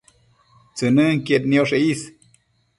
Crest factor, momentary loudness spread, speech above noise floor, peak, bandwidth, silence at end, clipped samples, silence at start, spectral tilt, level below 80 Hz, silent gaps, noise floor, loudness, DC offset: 16 dB; 15 LU; 43 dB; -4 dBFS; 11.5 kHz; 0.7 s; under 0.1%; 0.75 s; -6 dB/octave; -60 dBFS; none; -61 dBFS; -19 LUFS; under 0.1%